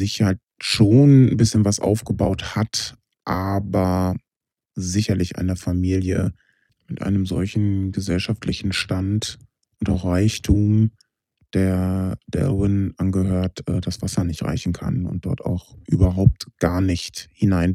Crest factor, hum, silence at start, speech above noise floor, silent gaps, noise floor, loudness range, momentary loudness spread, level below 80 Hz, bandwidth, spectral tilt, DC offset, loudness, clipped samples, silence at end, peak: 20 dB; none; 0 s; 68 dB; none; -88 dBFS; 6 LU; 9 LU; -38 dBFS; 14 kHz; -6.5 dB/octave; under 0.1%; -21 LUFS; under 0.1%; 0 s; 0 dBFS